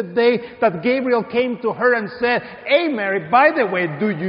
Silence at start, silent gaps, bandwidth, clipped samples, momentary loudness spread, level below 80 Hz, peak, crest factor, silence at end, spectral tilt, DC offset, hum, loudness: 0 s; none; 5.4 kHz; under 0.1%; 7 LU; -60 dBFS; -2 dBFS; 16 dB; 0 s; -3.5 dB/octave; under 0.1%; none; -18 LUFS